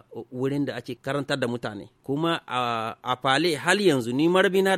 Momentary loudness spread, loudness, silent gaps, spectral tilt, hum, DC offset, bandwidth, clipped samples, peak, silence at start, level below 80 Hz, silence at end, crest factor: 12 LU; -25 LUFS; none; -5 dB/octave; none; under 0.1%; 15.5 kHz; under 0.1%; -4 dBFS; 0.1 s; -66 dBFS; 0 s; 20 dB